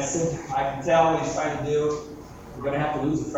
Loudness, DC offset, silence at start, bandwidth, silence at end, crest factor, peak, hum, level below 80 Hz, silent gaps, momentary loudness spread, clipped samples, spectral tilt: -25 LUFS; under 0.1%; 0 s; 15.5 kHz; 0 s; 18 dB; -8 dBFS; none; -48 dBFS; none; 14 LU; under 0.1%; -5 dB/octave